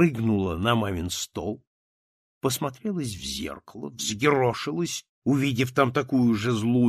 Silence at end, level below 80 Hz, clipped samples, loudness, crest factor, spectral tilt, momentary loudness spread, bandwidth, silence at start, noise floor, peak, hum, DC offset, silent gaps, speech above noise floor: 0 s; -52 dBFS; under 0.1%; -26 LUFS; 20 dB; -5 dB/octave; 11 LU; 14.5 kHz; 0 s; under -90 dBFS; -6 dBFS; none; under 0.1%; 1.67-2.41 s, 5.09-5.22 s; over 65 dB